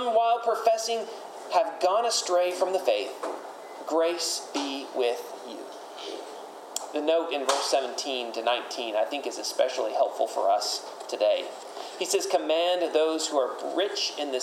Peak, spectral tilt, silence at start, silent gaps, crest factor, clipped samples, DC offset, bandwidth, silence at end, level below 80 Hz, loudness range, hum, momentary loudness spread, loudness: -10 dBFS; -0.5 dB/octave; 0 s; none; 18 dB; under 0.1%; under 0.1%; 16 kHz; 0 s; under -90 dBFS; 4 LU; none; 14 LU; -27 LUFS